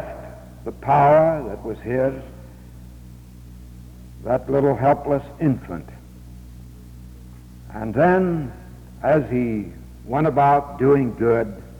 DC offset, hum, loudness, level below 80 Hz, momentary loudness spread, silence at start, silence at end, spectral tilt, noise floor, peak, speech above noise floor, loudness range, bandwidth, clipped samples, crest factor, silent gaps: under 0.1%; 60 Hz at -40 dBFS; -20 LUFS; -42 dBFS; 25 LU; 0 s; 0 s; -9 dB/octave; -41 dBFS; -6 dBFS; 22 dB; 5 LU; over 20 kHz; under 0.1%; 16 dB; none